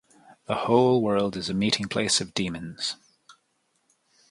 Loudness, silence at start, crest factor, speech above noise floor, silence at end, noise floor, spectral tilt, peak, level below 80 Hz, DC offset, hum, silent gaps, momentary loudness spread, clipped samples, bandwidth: -25 LUFS; 0.5 s; 22 dB; 47 dB; 1 s; -72 dBFS; -4 dB/octave; -6 dBFS; -58 dBFS; under 0.1%; none; none; 11 LU; under 0.1%; 11.5 kHz